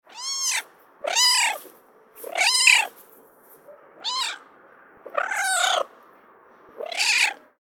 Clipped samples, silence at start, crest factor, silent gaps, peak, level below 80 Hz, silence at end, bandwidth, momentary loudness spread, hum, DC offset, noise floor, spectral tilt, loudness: under 0.1%; 0.15 s; 24 dB; none; -2 dBFS; -76 dBFS; 0.25 s; 19 kHz; 18 LU; none; under 0.1%; -53 dBFS; 3.5 dB/octave; -21 LUFS